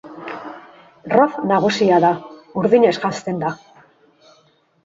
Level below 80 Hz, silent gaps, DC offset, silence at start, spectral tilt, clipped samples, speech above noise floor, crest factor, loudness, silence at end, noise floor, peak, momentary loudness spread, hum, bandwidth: -62 dBFS; none; under 0.1%; 0.05 s; -6 dB/octave; under 0.1%; 41 dB; 20 dB; -17 LUFS; 1.3 s; -57 dBFS; 0 dBFS; 18 LU; none; 8 kHz